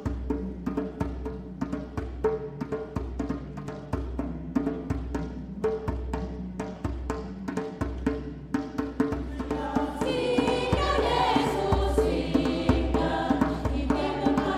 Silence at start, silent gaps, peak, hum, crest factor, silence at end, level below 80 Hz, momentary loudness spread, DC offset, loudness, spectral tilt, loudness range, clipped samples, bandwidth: 0 s; none; -10 dBFS; none; 18 dB; 0 s; -36 dBFS; 9 LU; under 0.1%; -29 LUFS; -6.5 dB/octave; 8 LU; under 0.1%; 13.5 kHz